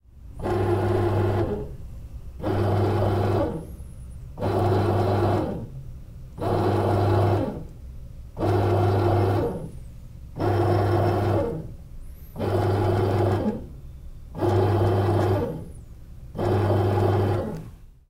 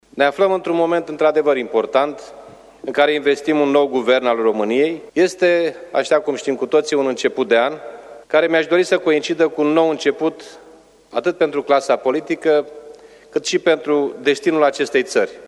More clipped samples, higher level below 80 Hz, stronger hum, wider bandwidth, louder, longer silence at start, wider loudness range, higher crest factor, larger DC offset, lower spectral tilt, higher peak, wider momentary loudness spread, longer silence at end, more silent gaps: neither; first, -40 dBFS vs -64 dBFS; neither; first, 15 kHz vs 12 kHz; second, -24 LUFS vs -17 LUFS; about the same, 0.15 s vs 0.15 s; about the same, 3 LU vs 2 LU; about the same, 16 dB vs 16 dB; neither; first, -8.5 dB/octave vs -4 dB/octave; second, -8 dBFS vs -2 dBFS; first, 20 LU vs 7 LU; first, 0.15 s vs 0 s; neither